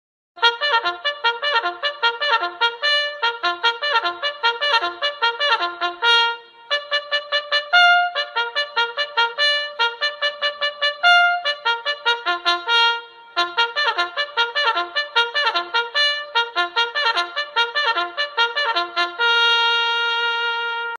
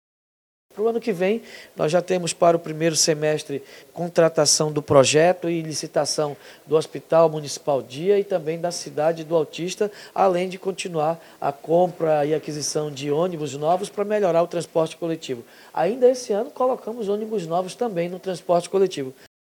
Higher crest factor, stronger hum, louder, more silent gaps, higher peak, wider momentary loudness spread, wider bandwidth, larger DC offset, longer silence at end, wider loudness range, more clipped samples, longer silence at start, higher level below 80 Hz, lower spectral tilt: about the same, 20 dB vs 22 dB; neither; first, -19 LUFS vs -22 LUFS; neither; about the same, -2 dBFS vs 0 dBFS; second, 7 LU vs 10 LU; second, 11 kHz vs 19 kHz; neither; second, 0 s vs 0.4 s; about the same, 2 LU vs 4 LU; neither; second, 0.35 s vs 0.75 s; second, -76 dBFS vs -68 dBFS; second, 1 dB/octave vs -4 dB/octave